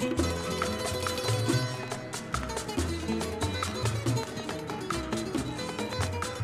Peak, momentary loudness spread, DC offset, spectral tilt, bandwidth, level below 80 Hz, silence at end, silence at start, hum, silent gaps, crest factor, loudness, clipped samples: -12 dBFS; 6 LU; under 0.1%; -4.5 dB/octave; 15.5 kHz; -46 dBFS; 0 s; 0 s; none; none; 18 dB; -31 LUFS; under 0.1%